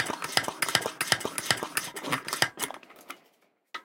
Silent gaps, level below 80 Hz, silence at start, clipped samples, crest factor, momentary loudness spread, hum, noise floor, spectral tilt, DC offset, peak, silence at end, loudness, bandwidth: none; -70 dBFS; 0 s; under 0.1%; 28 dB; 19 LU; none; -67 dBFS; -1.5 dB/octave; under 0.1%; -4 dBFS; 0.05 s; -28 LUFS; 17 kHz